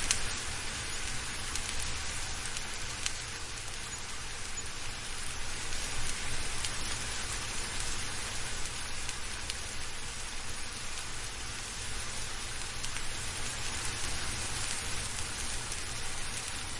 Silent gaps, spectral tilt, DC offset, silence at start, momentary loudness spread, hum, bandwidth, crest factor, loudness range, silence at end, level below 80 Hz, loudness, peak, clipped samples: none; -1.5 dB/octave; under 0.1%; 0 s; 4 LU; none; 11.5 kHz; 28 dB; 3 LU; 0 s; -42 dBFS; -36 LUFS; -6 dBFS; under 0.1%